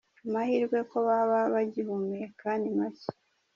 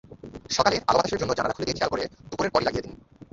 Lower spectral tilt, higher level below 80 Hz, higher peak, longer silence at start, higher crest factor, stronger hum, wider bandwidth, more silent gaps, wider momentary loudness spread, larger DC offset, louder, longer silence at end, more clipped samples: first, -6 dB/octave vs -4 dB/octave; second, -78 dBFS vs -50 dBFS; second, -16 dBFS vs -2 dBFS; first, 0.25 s vs 0.1 s; second, 14 dB vs 24 dB; neither; about the same, 7.2 kHz vs 7.8 kHz; neither; second, 10 LU vs 14 LU; neither; second, -30 LUFS vs -25 LUFS; about the same, 0.45 s vs 0.35 s; neither